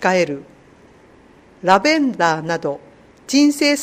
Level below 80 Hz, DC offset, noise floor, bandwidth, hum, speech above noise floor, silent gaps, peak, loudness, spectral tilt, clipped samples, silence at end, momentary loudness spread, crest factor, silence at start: -60 dBFS; under 0.1%; -48 dBFS; 15.5 kHz; none; 31 dB; none; 0 dBFS; -17 LUFS; -4 dB/octave; under 0.1%; 0 s; 12 LU; 18 dB; 0 s